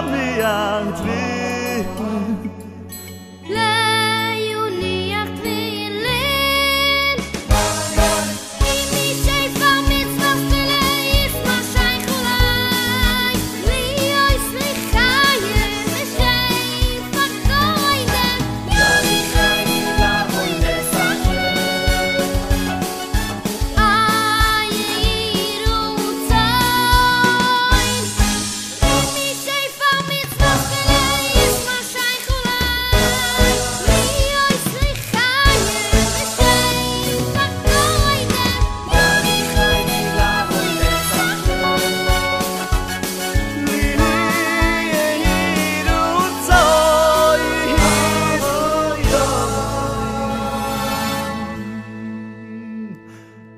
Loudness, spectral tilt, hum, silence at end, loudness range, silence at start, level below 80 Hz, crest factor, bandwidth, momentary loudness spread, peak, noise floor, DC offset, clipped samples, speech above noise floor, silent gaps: -17 LUFS; -3.5 dB/octave; none; 0 s; 4 LU; 0 s; -24 dBFS; 18 dB; 15.5 kHz; 8 LU; 0 dBFS; -40 dBFS; under 0.1%; under 0.1%; 20 dB; none